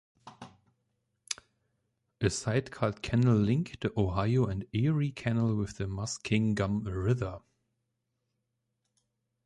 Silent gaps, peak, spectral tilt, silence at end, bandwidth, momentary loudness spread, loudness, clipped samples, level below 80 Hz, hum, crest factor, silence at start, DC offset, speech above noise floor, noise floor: none; -12 dBFS; -6.5 dB/octave; 2.05 s; 11.5 kHz; 12 LU; -31 LUFS; under 0.1%; -52 dBFS; none; 20 dB; 0.25 s; under 0.1%; 53 dB; -82 dBFS